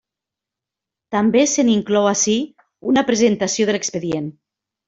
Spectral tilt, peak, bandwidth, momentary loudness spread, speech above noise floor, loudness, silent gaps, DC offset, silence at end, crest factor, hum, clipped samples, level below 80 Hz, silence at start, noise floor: -4 dB/octave; -2 dBFS; 8 kHz; 10 LU; 68 dB; -18 LUFS; none; under 0.1%; 0.55 s; 16 dB; none; under 0.1%; -60 dBFS; 1.1 s; -86 dBFS